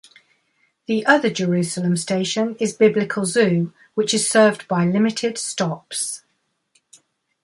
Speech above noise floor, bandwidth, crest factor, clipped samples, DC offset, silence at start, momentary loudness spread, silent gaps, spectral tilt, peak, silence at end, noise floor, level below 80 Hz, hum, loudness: 51 dB; 11.5 kHz; 18 dB; under 0.1%; under 0.1%; 0.9 s; 9 LU; none; -4.5 dB/octave; -2 dBFS; 1.25 s; -70 dBFS; -64 dBFS; none; -20 LUFS